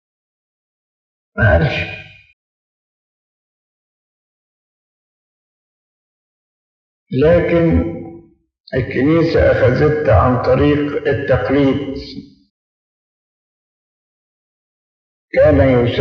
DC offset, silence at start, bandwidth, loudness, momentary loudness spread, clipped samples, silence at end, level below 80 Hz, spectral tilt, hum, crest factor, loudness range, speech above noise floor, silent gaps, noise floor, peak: under 0.1%; 1.35 s; 6.6 kHz; -14 LUFS; 15 LU; under 0.1%; 0 s; -36 dBFS; -9 dB/octave; none; 18 dB; 9 LU; 28 dB; 2.33-7.06 s, 8.60-8.64 s, 12.50-15.28 s; -41 dBFS; 0 dBFS